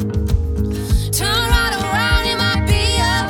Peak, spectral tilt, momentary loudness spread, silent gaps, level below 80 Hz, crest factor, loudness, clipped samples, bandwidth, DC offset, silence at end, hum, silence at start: -2 dBFS; -4 dB/octave; 4 LU; none; -22 dBFS; 16 dB; -17 LUFS; under 0.1%; 18.5 kHz; under 0.1%; 0 s; none; 0 s